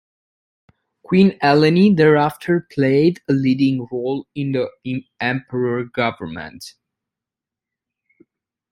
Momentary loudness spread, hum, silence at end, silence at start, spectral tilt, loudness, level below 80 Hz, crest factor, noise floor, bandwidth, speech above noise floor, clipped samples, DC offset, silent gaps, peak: 15 LU; none; 2 s; 1.1 s; -7.5 dB/octave; -18 LUFS; -58 dBFS; 18 dB; -87 dBFS; 15.5 kHz; 70 dB; under 0.1%; under 0.1%; none; -2 dBFS